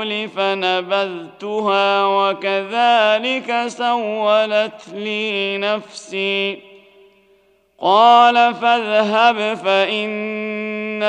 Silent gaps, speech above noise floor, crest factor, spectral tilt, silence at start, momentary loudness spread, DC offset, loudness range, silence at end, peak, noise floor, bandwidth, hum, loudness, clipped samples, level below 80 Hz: none; 39 dB; 18 dB; -4 dB/octave; 0 s; 11 LU; under 0.1%; 6 LU; 0 s; 0 dBFS; -56 dBFS; 9.4 kHz; none; -17 LUFS; under 0.1%; -74 dBFS